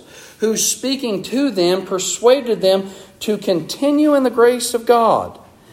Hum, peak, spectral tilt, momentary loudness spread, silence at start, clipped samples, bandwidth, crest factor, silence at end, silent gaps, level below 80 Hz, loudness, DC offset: none; -2 dBFS; -3.5 dB/octave; 8 LU; 0.15 s; under 0.1%; 16.5 kHz; 16 dB; 0.35 s; none; -62 dBFS; -16 LUFS; under 0.1%